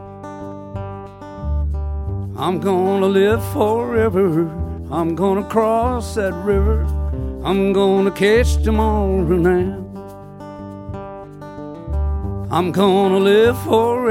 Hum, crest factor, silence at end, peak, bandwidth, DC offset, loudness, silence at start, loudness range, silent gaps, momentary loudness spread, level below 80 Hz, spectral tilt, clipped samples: none; 16 dB; 0 s; -2 dBFS; 16.5 kHz; under 0.1%; -18 LUFS; 0 s; 5 LU; none; 18 LU; -26 dBFS; -7 dB/octave; under 0.1%